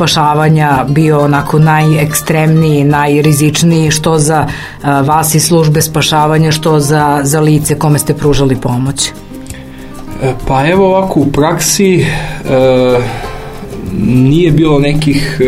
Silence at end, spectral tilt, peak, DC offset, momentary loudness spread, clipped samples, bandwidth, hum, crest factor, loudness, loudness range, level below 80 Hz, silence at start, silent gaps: 0 s; -5.5 dB/octave; 0 dBFS; under 0.1%; 10 LU; 0.1%; 16 kHz; none; 10 dB; -9 LUFS; 4 LU; -28 dBFS; 0 s; none